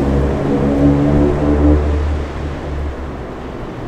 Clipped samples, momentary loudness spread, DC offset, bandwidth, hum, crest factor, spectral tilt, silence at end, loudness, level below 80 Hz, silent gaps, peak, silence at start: under 0.1%; 14 LU; under 0.1%; 8.4 kHz; none; 16 dB; -9 dB/octave; 0 s; -16 LUFS; -20 dBFS; none; 0 dBFS; 0 s